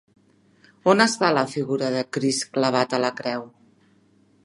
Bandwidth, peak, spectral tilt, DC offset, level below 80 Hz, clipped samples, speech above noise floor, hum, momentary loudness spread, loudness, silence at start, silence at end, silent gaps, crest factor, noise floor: 11.5 kHz; -2 dBFS; -4 dB/octave; under 0.1%; -72 dBFS; under 0.1%; 37 dB; none; 8 LU; -22 LUFS; 0.85 s; 0.95 s; none; 22 dB; -59 dBFS